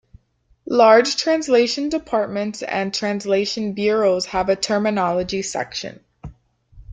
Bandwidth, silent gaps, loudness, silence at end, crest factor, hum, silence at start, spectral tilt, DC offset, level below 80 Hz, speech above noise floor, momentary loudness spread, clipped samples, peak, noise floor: 9.4 kHz; none; -19 LUFS; 0 s; 18 dB; none; 0.65 s; -4 dB/octave; under 0.1%; -50 dBFS; 42 dB; 11 LU; under 0.1%; -2 dBFS; -61 dBFS